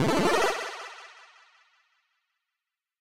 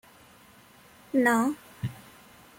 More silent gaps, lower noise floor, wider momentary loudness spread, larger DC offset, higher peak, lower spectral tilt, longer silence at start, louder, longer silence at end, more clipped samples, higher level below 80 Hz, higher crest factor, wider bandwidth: neither; first, -88 dBFS vs -55 dBFS; first, 23 LU vs 15 LU; neither; about the same, -12 dBFS vs -12 dBFS; about the same, -4.5 dB/octave vs -5.5 dB/octave; second, 0 s vs 1.15 s; about the same, -26 LUFS vs -27 LUFS; first, 1.55 s vs 0.65 s; neither; first, -58 dBFS vs -64 dBFS; about the same, 18 dB vs 20 dB; about the same, 16 kHz vs 16.5 kHz